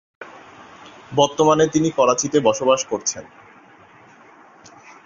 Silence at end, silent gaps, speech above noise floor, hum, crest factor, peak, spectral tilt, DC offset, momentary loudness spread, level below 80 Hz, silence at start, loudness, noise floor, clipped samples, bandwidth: 1.8 s; none; 30 dB; none; 20 dB; -2 dBFS; -4 dB/octave; under 0.1%; 21 LU; -60 dBFS; 0.2 s; -18 LUFS; -48 dBFS; under 0.1%; 7.6 kHz